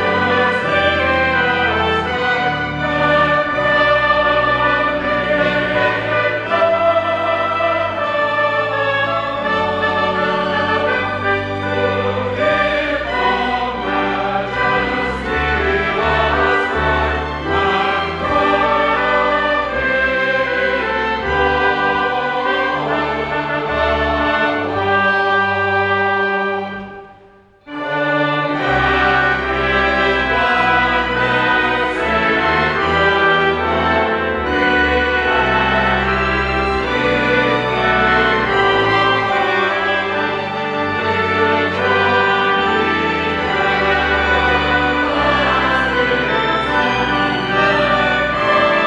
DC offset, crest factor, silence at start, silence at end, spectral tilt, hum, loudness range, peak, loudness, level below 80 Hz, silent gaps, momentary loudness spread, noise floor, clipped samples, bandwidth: under 0.1%; 14 dB; 0 s; 0 s; -5.5 dB/octave; none; 3 LU; -2 dBFS; -15 LUFS; -34 dBFS; none; 5 LU; -46 dBFS; under 0.1%; 10 kHz